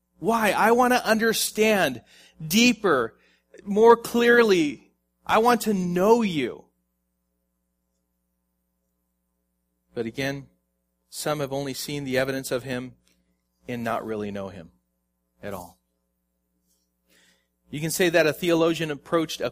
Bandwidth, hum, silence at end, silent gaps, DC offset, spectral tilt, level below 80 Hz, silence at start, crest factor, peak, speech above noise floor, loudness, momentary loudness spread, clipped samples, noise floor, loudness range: 15.5 kHz; none; 0 s; none; under 0.1%; -4 dB/octave; -60 dBFS; 0.2 s; 22 dB; -2 dBFS; 53 dB; -23 LUFS; 19 LU; under 0.1%; -76 dBFS; 16 LU